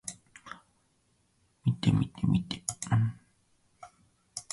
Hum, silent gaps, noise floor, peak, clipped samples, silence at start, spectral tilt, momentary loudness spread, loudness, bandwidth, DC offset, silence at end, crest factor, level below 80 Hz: none; none; -71 dBFS; -12 dBFS; under 0.1%; 0.05 s; -5.5 dB/octave; 20 LU; -30 LUFS; 11.5 kHz; under 0.1%; 0.1 s; 22 dB; -54 dBFS